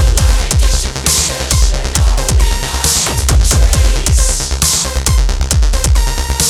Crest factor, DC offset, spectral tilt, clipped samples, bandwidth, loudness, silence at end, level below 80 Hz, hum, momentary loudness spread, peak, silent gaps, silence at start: 10 dB; under 0.1%; -3 dB/octave; under 0.1%; 20 kHz; -12 LUFS; 0 s; -12 dBFS; none; 3 LU; 0 dBFS; none; 0 s